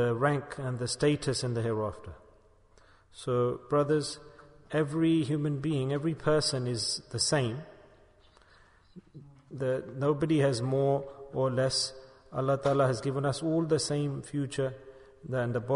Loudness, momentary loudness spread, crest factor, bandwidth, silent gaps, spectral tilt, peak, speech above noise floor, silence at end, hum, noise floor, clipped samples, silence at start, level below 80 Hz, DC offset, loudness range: -30 LUFS; 9 LU; 18 dB; 10.5 kHz; none; -5.5 dB/octave; -14 dBFS; 31 dB; 0 s; none; -60 dBFS; under 0.1%; 0 s; -60 dBFS; under 0.1%; 4 LU